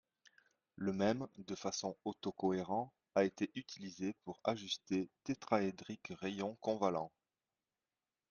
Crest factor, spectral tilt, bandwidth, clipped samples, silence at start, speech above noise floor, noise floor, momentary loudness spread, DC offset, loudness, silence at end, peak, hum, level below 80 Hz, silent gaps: 22 dB; -5 dB/octave; 7.4 kHz; under 0.1%; 0.8 s; over 50 dB; under -90 dBFS; 8 LU; under 0.1%; -40 LUFS; 1.25 s; -18 dBFS; none; -78 dBFS; none